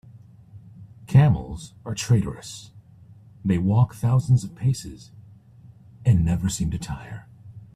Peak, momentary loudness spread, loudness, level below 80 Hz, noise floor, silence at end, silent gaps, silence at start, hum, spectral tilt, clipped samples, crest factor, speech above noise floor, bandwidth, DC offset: -4 dBFS; 19 LU; -23 LUFS; -44 dBFS; -49 dBFS; 0.1 s; none; 0.15 s; none; -7 dB/octave; under 0.1%; 20 dB; 27 dB; 14 kHz; under 0.1%